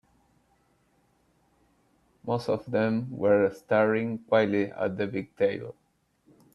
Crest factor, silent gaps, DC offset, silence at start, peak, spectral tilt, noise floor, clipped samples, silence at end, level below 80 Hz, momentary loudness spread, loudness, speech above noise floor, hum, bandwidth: 20 dB; none; under 0.1%; 2.25 s; -10 dBFS; -8 dB/octave; -68 dBFS; under 0.1%; 0.8 s; -68 dBFS; 9 LU; -27 LUFS; 42 dB; none; 11.5 kHz